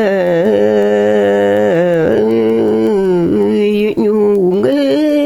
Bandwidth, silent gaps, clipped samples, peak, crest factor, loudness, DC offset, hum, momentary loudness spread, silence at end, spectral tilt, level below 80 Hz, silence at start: 13 kHz; none; under 0.1%; 0 dBFS; 10 dB; -12 LUFS; under 0.1%; none; 1 LU; 0 s; -7.5 dB/octave; -46 dBFS; 0 s